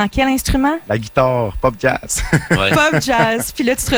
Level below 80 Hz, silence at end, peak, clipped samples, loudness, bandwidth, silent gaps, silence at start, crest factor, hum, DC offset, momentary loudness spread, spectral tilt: -30 dBFS; 0 s; -2 dBFS; under 0.1%; -16 LUFS; over 20 kHz; none; 0 s; 14 dB; none; under 0.1%; 5 LU; -4.5 dB/octave